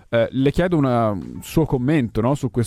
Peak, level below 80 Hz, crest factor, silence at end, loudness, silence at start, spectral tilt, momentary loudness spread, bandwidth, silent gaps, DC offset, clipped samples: -4 dBFS; -38 dBFS; 16 dB; 0 s; -20 LUFS; 0.1 s; -7.5 dB/octave; 5 LU; 15 kHz; none; under 0.1%; under 0.1%